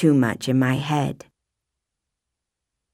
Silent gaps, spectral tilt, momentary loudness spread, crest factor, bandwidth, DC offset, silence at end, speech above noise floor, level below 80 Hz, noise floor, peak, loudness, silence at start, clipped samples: none; -6.5 dB/octave; 9 LU; 18 dB; 15 kHz; under 0.1%; 1.8 s; 63 dB; -60 dBFS; -83 dBFS; -6 dBFS; -22 LUFS; 0 s; under 0.1%